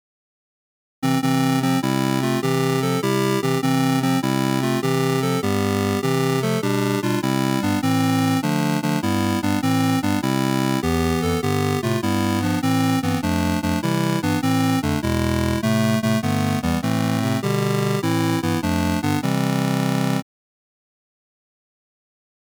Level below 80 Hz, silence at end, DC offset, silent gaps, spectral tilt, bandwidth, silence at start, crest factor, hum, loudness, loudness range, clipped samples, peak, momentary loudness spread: -44 dBFS; 2.2 s; under 0.1%; none; -6 dB/octave; over 20 kHz; 1 s; 8 dB; none; -21 LUFS; 1 LU; under 0.1%; -14 dBFS; 2 LU